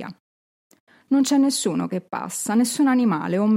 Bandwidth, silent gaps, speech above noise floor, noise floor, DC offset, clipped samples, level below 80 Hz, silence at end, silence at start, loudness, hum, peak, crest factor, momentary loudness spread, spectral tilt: 16.5 kHz; 0.20-0.70 s, 0.80-0.87 s; over 70 dB; under -90 dBFS; under 0.1%; under 0.1%; -74 dBFS; 0 s; 0 s; -21 LUFS; none; -10 dBFS; 12 dB; 10 LU; -4.5 dB/octave